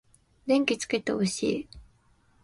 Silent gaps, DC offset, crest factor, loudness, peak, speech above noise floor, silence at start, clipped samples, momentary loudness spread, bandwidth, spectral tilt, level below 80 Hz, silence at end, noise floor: none; under 0.1%; 22 dB; -28 LUFS; -8 dBFS; 37 dB; 0.45 s; under 0.1%; 13 LU; 11.5 kHz; -4.5 dB/octave; -58 dBFS; 0.6 s; -64 dBFS